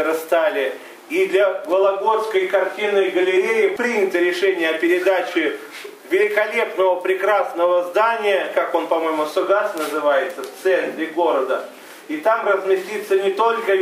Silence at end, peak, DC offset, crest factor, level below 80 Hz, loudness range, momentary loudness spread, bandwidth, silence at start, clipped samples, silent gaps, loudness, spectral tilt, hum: 0 s; -4 dBFS; under 0.1%; 16 dB; -80 dBFS; 2 LU; 7 LU; 16 kHz; 0 s; under 0.1%; none; -19 LUFS; -3.5 dB/octave; none